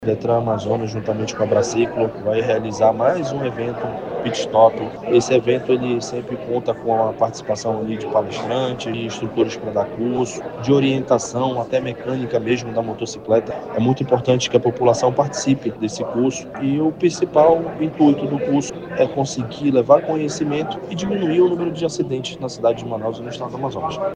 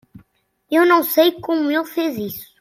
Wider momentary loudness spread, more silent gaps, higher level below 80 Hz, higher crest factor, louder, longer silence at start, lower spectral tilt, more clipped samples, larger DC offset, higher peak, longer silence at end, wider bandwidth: about the same, 9 LU vs 10 LU; neither; first, -54 dBFS vs -62 dBFS; about the same, 20 dB vs 16 dB; about the same, -20 LUFS vs -18 LUFS; second, 0 s vs 0.15 s; first, -6 dB/octave vs -4 dB/octave; neither; neither; about the same, 0 dBFS vs -2 dBFS; second, 0 s vs 0.15 s; second, 10 kHz vs 16.5 kHz